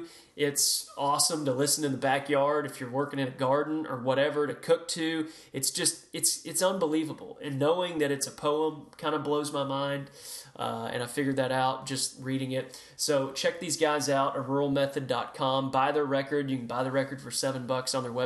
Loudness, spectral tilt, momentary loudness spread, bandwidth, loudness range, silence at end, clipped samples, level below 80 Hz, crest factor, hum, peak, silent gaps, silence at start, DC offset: -29 LUFS; -3.5 dB/octave; 8 LU; 13 kHz; 4 LU; 0 s; under 0.1%; -72 dBFS; 18 dB; none; -12 dBFS; none; 0 s; under 0.1%